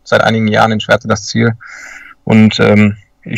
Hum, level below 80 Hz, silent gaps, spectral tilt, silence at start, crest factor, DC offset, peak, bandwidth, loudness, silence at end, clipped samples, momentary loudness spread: none; -46 dBFS; none; -6 dB/octave; 0.05 s; 12 dB; under 0.1%; 0 dBFS; 8.6 kHz; -11 LUFS; 0 s; 0.6%; 21 LU